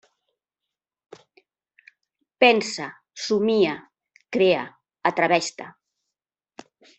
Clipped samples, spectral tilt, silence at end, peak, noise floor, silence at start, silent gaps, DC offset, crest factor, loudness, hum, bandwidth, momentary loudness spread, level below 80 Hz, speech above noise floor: under 0.1%; -4 dB/octave; 1.3 s; -2 dBFS; -87 dBFS; 2.4 s; none; under 0.1%; 22 dB; -22 LUFS; none; 8.4 kHz; 19 LU; -70 dBFS; 66 dB